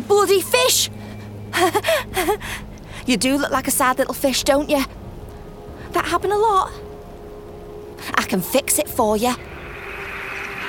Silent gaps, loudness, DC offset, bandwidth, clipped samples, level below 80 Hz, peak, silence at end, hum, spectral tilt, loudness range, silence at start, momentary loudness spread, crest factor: none; -19 LUFS; under 0.1%; 19 kHz; under 0.1%; -42 dBFS; -2 dBFS; 0 s; none; -3 dB/octave; 4 LU; 0 s; 21 LU; 18 dB